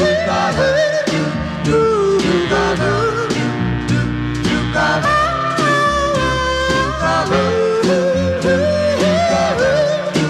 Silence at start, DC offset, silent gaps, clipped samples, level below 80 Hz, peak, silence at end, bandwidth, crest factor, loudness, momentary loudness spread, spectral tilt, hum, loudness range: 0 s; under 0.1%; none; under 0.1%; -34 dBFS; -4 dBFS; 0 s; 13 kHz; 12 dB; -15 LUFS; 4 LU; -5.5 dB/octave; none; 1 LU